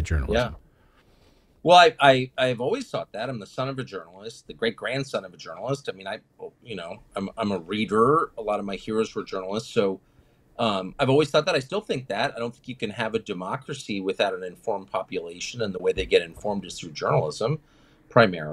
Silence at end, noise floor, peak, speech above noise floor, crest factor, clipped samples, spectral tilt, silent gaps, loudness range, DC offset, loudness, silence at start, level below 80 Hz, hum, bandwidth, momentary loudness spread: 0 s; -59 dBFS; -2 dBFS; 34 dB; 24 dB; under 0.1%; -5 dB/octave; none; 9 LU; under 0.1%; -25 LUFS; 0 s; -46 dBFS; none; 12.5 kHz; 15 LU